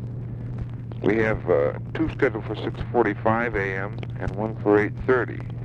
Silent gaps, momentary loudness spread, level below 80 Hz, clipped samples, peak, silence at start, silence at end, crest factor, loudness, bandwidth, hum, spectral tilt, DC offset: none; 12 LU; -42 dBFS; under 0.1%; -6 dBFS; 0 s; 0 s; 18 dB; -25 LUFS; 6.6 kHz; none; -9 dB/octave; under 0.1%